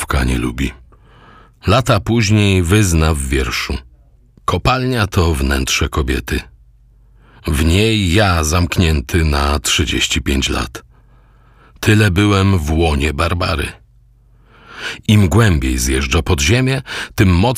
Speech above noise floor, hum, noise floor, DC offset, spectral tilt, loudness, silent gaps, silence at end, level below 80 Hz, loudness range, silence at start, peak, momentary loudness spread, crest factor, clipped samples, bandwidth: 34 dB; none; -48 dBFS; under 0.1%; -5 dB/octave; -15 LUFS; none; 0 s; -24 dBFS; 3 LU; 0 s; 0 dBFS; 11 LU; 16 dB; under 0.1%; 16 kHz